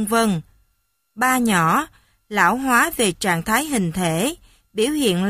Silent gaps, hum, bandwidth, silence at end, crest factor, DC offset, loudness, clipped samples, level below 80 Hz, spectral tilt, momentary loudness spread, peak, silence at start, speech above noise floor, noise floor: none; none; 15.5 kHz; 0 s; 18 dB; under 0.1%; -19 LUFS; under 0.1%; -50 dBFS; -4 dB/octave; 9 LU; -2 dBFS; 0 s; 49 dB; -68 dBFS